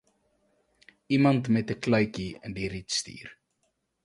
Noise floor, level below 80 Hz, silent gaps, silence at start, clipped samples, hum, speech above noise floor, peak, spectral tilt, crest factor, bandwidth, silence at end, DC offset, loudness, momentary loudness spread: -76 dBFS; -58 dBFS; none; 1.1 s; under 0.1%; none; 49 dB; -10 dBFS; -5.5 dB/octave; 20 dB; 11.5 kHz; 0.7 s; under 0.1%; -27 LUFS; 16 LU